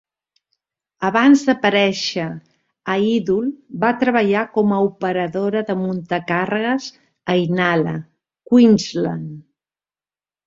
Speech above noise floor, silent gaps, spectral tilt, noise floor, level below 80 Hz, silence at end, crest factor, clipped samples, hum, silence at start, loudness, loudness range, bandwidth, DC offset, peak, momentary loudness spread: over 73 dB; none; -6 dB/octave; under -90 dBFS; -60 dBFS; 1.05 s; 18 dB; under 0.1%; none; 1 s; -18 LUFS; 2 LU; 7.8 kHz; under 0.1%; -2 dBFS; 13 LU